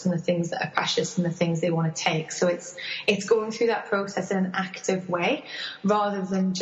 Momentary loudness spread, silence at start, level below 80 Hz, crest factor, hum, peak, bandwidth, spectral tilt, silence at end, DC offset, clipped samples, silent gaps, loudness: 5 LU; 0 s; -68 dBFS; 18 dB; none; -8 dBFS; 8.2 kHz; -5 dB/octave; 0 s; under 0.1%; under 0.1%; none; -26 LUFS